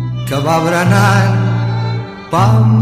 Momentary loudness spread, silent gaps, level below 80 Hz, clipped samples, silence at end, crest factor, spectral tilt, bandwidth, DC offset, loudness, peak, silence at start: 8 LU; none; -40 dBFS; under 0.1%; 0 s; 12 dB; -6.5 dB/octave; 14.5 kHz; under 0.1%; -13 LUFS; 0 dBFS; 0 s